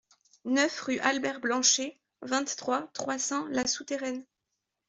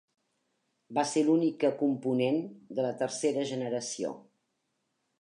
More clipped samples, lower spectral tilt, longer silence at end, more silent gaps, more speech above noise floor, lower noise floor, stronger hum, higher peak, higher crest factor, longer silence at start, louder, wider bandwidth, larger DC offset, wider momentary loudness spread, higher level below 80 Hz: neither; second, -1 dB/octave vs -5 dB/octave; second, 0.65 s vs 1 s; neither; first, 54 dB vs 50 dB; first, -84 dBFS vs -80 dBFS; neither; first, -10 dBFS vs -14 dBFS; about the same, 20 dB vs 18 dB; second, 0.45 s vs 0.9 s; about the same, -29 LUFS vs -30 LUFS; second, 8.2 kHz vs 11 kHz; neither; first, 13 LU vs 10 LU; first, -72 dBFS vs -84 dBFS